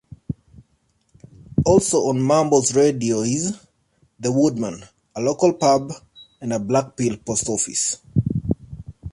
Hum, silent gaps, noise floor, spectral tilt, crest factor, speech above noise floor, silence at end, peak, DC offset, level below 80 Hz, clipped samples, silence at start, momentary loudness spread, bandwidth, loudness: none; none; -65 dBFS; -5 dB/octave; 18 dB; 46 dB; 0 s; -4 dBFS; under 0.1%; -44 dBFS; under 0.1%; 0.3 s; 17 LU; 11.5 kHz; -20 LUFS